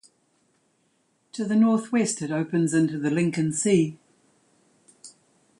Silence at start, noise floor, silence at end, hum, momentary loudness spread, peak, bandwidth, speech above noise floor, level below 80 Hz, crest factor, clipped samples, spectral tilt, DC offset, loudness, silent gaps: 1.35 s; -69 dBFS; 0.5 s; none; 7 LU; -8 dBFS; 11.5 kHz; 46 dB; -68 dBFS; 18 dB; under 0.1%; -5.5 dB/octave; under 0.1%; -24 LUFS; none